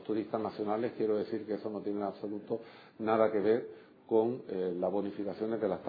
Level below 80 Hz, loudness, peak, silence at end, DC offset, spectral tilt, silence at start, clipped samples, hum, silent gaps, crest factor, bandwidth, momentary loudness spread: -80 dBFS; -34 LUFS; -14 dBFS; 0 s; under 0.1%; -6 dB/octave; 0 s; under 0.1%; none; none; 18 dB; 5 kHz; 10 LU